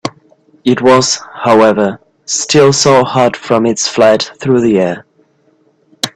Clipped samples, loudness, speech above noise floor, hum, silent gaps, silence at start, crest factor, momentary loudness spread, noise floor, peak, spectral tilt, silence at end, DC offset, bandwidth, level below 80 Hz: under 0.1%; -10 LUFS; 43 dB; none; none; 0.05 s; 12 dB; 9 LU; -53 dBFS; 0 dBFS; -4 dB/octave; 0.05 s; under 0.1%; 13 kHz; -50 dBFS